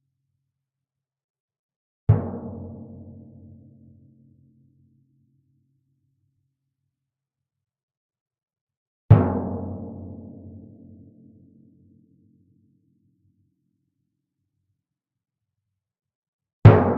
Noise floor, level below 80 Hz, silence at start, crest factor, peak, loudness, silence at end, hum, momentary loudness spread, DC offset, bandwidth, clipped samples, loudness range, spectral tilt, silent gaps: -87 dBFS; -48 dBFS; 2.1 s; 26 dB; 0 dBFS; -20 LUFS; 0 s; none; 29 LU; under 0.1%; 4.2 kHz; under 0.1%; 20 LU; -9.5 dB/octave; 7.83-7.88 s, 7.97-8.09 s, 8.21-8.26 s, 8.43-8.48 s, 8.61-8.67 s, 8.77-9.09 s, 16.15-16.39 s, 16.53-16.62 s